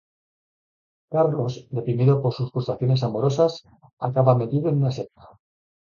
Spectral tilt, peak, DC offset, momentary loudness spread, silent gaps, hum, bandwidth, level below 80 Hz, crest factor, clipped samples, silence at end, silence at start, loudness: -8.5 dB/octave; -4 dBFS; under 0.1%; 10 LU; 3.93-3.97 s; none; 7.2 kHz; -58 dBFS; 20 dB; under 0.1%; 0.8 s; 1.1 s; -23 LUFS